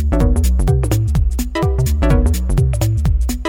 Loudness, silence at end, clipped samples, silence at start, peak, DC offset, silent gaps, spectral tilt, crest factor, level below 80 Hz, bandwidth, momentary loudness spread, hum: -16 LUFS; 0 s; under 0.1%; 0 s; -2 dBFS; under 0.1%; none; -6.5 dB/octave; 12 dB; -16 dBFS; 17.5 kHz; 3 LU; none